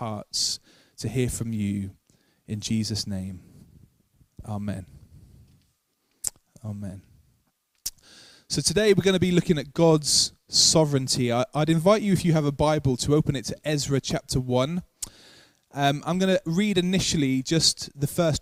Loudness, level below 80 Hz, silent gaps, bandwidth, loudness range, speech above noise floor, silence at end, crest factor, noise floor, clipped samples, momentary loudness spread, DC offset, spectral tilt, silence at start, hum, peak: -24 LUFS; -50 dBFS; none; 16 kHz; 17 LU; 48 dB; 0 s; 22 dB; -72 dBFS; under 0.1%; 16 LU; under 0.1%; -4.5 dB/octave; 0 s; none; -4 dBFS